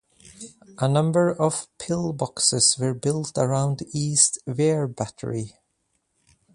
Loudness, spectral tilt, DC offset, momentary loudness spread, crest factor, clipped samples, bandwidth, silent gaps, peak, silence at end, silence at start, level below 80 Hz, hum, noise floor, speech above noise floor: -22 LUFS; -4 dB/octave; under 0.1%; 14 LU; 24 dB; under 0.1%; 11.5 kHz; none; 0 dBFS; 1.05 s; 0.25 s; -60 dBFS; none; -73 dBFS; 50 dB